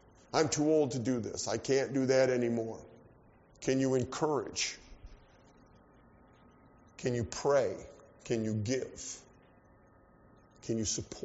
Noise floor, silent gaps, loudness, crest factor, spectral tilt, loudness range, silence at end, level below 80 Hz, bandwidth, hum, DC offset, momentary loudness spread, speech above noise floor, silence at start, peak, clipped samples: -62 dBFS; none; -33 LUFS; 20 dB; -5 dB/octave; 7 LU; 0 s; -62 dBFS; 8 kHz; none; under 0.1%; 15 LU; 30 dB; 0.35 s; -14 dBFS; under 0.1%